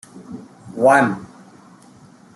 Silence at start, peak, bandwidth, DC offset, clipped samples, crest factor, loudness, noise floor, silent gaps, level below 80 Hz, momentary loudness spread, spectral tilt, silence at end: 0.15 s; -2 dBFS; 12 kHz; under 0.1%; under 0.1%; 20 dB; -16 LUFS; -47 dBFS; none; -64 dBFS; 24 LU; -6 dB/octave; 1.1 s